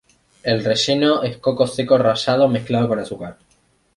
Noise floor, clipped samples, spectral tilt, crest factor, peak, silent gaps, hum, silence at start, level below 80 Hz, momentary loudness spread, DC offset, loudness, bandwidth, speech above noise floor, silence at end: -60 dBFS; under 0.1%; -5.5 dB/octave; 16 dB; -2 dBFS; none; none; 0.45 s; -56 dBFS; 11 LU; under 0.1%; -18 LUFS; 11.5 kHz; 42 dB; 0.65 s